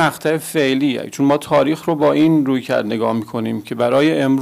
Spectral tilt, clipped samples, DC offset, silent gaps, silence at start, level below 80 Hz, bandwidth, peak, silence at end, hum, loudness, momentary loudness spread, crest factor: -6 dB/octave; under 0.1%; under 0.1%; none; 0 s; -60 dBFS; 16 kHz; -6 dBFS; 0 s; none; -17 LUFS; 6 LU; 10 dB